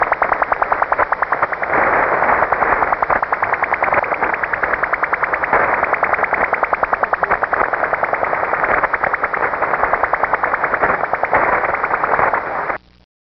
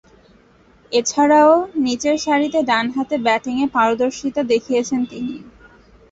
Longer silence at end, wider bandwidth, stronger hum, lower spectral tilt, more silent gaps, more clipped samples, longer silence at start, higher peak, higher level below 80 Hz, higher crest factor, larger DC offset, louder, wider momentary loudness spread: about the same, 0.55 s vs 0.6 s; second, 6 kHz vs 8 kHz; neither; about the same, -3 dB/octave vs -3.5 dB/octave; neither; neither; second, 0 s vs 0.9 s; about the same, -2 dBFS vs -2 dBFS; first, -44 dBFS vs -56 dBFS; about the same, 16 dB vs 16 dB; neither; about the same, -16 LUFS vs -18 LUFS; second, 3 LU vs 10 LU